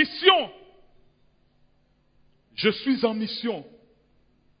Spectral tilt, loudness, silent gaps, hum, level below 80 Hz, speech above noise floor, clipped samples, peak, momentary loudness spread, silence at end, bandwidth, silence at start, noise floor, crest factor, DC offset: -8 dB/octave; -24 LUFS; none; none; -68 dBFS; 41 dB; under 0.1%; -4 dBFS; 17 LU; 0.9 s; 5.2 kHz; 0 s; -64 dBFS; 24 dB; under 0.1%